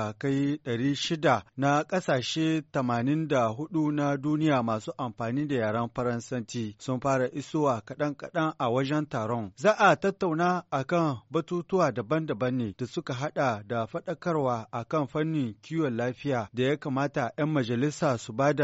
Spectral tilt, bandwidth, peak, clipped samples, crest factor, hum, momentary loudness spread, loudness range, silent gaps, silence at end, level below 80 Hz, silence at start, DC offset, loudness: -5.5 dB/octave; 8 kHz; -8 dBFS; under 0.1%; 20 dB; none; 7 LU; 3 LU; none; 0 s; -64 dBFS; 0 s; under 0.1%; -28 LUFS